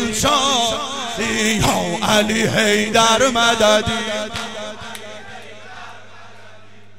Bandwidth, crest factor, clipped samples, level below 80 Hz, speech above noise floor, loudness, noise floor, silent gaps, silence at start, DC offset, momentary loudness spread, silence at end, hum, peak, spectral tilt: 16 kHz; 18 dB; under 0.1%; -42 dBFS; 29 dB; -16 LUFS; -46 dBFS; none; 0 s; 1%; 22 LU; 0.5 s; none; -2 dBFS; -2.5 dB/octave